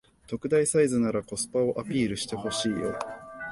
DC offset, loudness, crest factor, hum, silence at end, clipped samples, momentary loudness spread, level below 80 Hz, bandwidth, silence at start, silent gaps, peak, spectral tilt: under 0.1%; -27 LUFS; 16 dB; none; 0 s; under 0.1%; 13 LU; -58 dBFS; 12 kHz; 0.3 s; none; -12 dBFS; -4.5 dB/octave